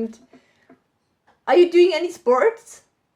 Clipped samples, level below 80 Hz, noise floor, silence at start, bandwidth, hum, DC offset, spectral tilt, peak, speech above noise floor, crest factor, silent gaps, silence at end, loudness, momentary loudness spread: under 0.1%; -74 dBFS; -69 dBFS; 0 s; 11 kHz; none; under 0.1%; -4 dB/octave; -4 dBFS; 51 dB; 16 dB; none; 0.6 s; -17 LUFS; 18 LU